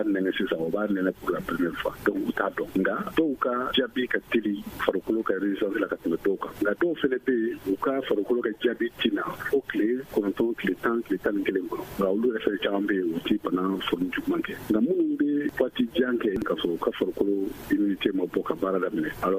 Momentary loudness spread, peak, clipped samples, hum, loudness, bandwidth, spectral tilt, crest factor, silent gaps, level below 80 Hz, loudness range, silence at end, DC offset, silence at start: 3 LU; -6 dBFS; under 0.1%; none; -27 LUFS; 15.5 kHz; -6 dB/octave; 20 dB; none; -56 dBFS; 1 LU; 0 s; under 0.1%; 0 s